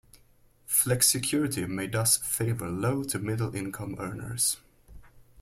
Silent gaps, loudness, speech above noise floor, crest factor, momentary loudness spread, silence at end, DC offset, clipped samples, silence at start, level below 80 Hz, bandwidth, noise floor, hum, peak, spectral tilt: none; -27 LUFS; 32 dB; 22 dB; 13 LU; 0 s; under 0.1%; under 0.1%; 0.15 s; -56 dBFS; 16.5 kHz; -61 dBFS; none; -8 dBFS; -3.5 dB/octave